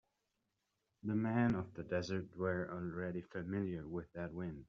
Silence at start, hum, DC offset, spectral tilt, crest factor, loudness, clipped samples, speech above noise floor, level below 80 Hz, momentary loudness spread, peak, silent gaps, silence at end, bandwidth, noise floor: 1.05 s; none; under 0.1%; -7 dB/octave; 20 dB; -41 LUFS; under 0.1%; 46 dB; -68 dBFS; 10 LU; -22 dBFS; none; 0.05 s; 7.4 kHz; -86 dBFS